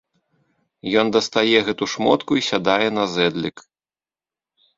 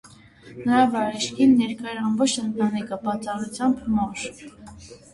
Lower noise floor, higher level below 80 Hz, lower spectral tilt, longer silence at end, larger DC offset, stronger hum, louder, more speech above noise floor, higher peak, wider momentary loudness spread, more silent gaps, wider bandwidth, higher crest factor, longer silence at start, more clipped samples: first, under -90 dBFS vs -47 dBFS; second, -60 dBFS vs -54 dBFS; about the same, -4 dB/octave vs -4.5 dB/octave; first, 1.2 s vs 0.15 s; neither; neither; first, -19 LUFS vs -23 LUFS; first, over 71 dB vs 24 dB; first, -2 dBFS vs -6 dBFS; second, 7 LU vs 16 LU; neither; second, 7.8 kHz vs 11.5 kHz; about the same, 20 dB vs 18 dB; first, 0.85 s vs 0.05 s; neither